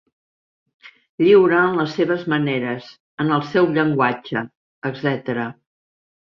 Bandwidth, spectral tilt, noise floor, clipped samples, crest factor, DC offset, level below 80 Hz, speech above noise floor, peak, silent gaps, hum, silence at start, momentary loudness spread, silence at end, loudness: 6.6 kHz; -8 dB/octave; under -90 dBFS; under 0.1%; 18 dB; under 0.1%; -62 dBFS; over 72 dB; -4 dBFS; 1.09-1.18 s, 3.00-3.18 s, 4.57-4.82 s; none; 0.85 s; 16 LU; 0.9 s; -19 LUFS